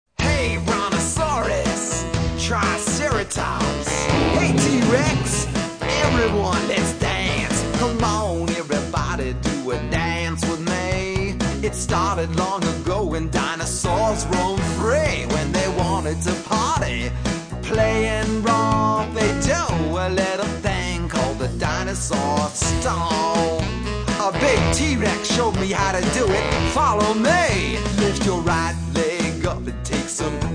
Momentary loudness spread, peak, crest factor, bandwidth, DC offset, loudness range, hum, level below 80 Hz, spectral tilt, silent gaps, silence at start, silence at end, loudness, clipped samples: 6 LU; -4 dBFS; 16 dB; 10.5 kHz; under 0.1%; 3 LU; none; -32 dBFS; -4.5 dB/octave; none; 0.2 s; 0 s; -21 LUFS; under 0.1%